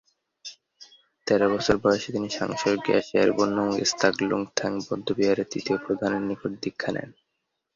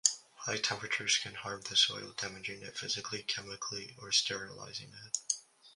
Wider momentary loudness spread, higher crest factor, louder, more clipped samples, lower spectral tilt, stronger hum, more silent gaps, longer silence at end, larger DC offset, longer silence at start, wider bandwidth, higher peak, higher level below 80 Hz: about the same, 11 LU vs 12 LU; second, 22 dB vs 32 dB; first, -25 LUFS vs -34 LUFS; neither; first, -4.5 dB/octave vs 0 dB/octave; neither; neither; first, 0.65 s vs 0.05 s; neither; first, 0.45 s vs 0.05 s; second, 7.6 kHz vs 11.5 kHz; about the same, -4 dBFS vs -6 dBFS; first, -58 dBFS vs -72 dBFS